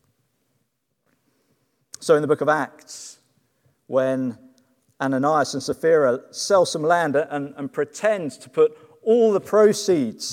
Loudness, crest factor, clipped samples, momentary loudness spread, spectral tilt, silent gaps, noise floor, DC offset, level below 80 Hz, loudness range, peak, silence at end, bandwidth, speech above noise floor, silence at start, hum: -21 LUFS; 18 dB; under 0.1%; 12 LU; -4.5 dB/octave; none; -73 dBFS; under 0.1%; -72 dBFS; 5 LU; -4 dBFS; 0 s; 15.5 kHz; 53 dB; 2 s; none